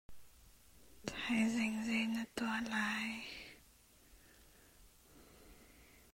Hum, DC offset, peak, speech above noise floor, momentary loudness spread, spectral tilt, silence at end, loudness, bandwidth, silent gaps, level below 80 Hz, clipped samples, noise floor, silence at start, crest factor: none; under 0.1%; -22 dBFS; 29 dB; 26 LU; -3.5 dB/octave; 0.15 s; -38 LUFS; 16 kHz; none; -68 dBFS; under 0.1%; -66 dBFS; 0.1 s; 20 dB